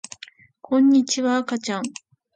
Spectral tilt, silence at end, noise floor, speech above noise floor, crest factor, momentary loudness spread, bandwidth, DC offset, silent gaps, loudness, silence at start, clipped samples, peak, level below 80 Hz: -3.5 dB/octave; 0.45 s; -47 dBFS; 27 dB; 14 dB; 22 LU; 9.2 kHz; under 0.1%; none; -21 LUFS; 0.7 s; under 0.1%; -10 dBFS; -74 dBFS